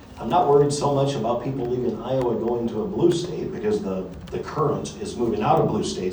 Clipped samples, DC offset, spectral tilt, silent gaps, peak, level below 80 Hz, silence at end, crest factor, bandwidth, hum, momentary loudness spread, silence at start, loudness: under 0.1%; under 0.1%; -6.5 dB/octave; none; -4 dBFS; -48 dBFS; 0 s; 18 dB; over 20 kHz; none; 11 LU; 0 s; -23 LUFS